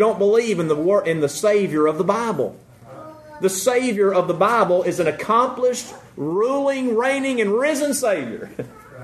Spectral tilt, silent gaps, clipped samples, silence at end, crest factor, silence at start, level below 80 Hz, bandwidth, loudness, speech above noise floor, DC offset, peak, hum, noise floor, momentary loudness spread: -4.5 dB/octave; none; under 0.1%; 0 s; 16 dB; 0 s; -62 dBFS; 13.5 kHz; -19 LUFS; 21 dB; under 0.1%; -2 dBFS; none; -40 dBFS; 14 LU